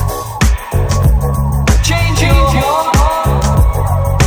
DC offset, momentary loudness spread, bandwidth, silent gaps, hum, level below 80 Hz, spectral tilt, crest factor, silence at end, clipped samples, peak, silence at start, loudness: under 0.1%; 4 LU; 17 kHz; none; none; -14 dBFS; -5 dB/octave; 10 dB; 0 s; under 0.1%; 0 dBFS; 0 s; -13 LUFS